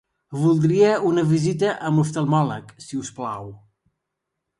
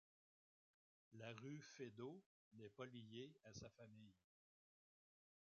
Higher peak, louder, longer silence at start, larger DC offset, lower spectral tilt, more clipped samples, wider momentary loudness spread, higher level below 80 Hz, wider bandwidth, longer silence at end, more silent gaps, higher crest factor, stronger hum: first, -6 dBFS vs -40 dBFS; first, -21 LUFS vs -59 LUFS; second, 0.3 s vs 1.1 s; neither; first, -7 dB/octave vs -5 dB/octave; neither; first, 16 LU vs 10 LU; first, -62 dBFS vs -88 dBFS; first, 11 kHz vs 7.2 kHz; second, 1.05 s vs 1.25 s; second, none vs 2.26-2.51 s; second, 16 dB vs 22 dB; neither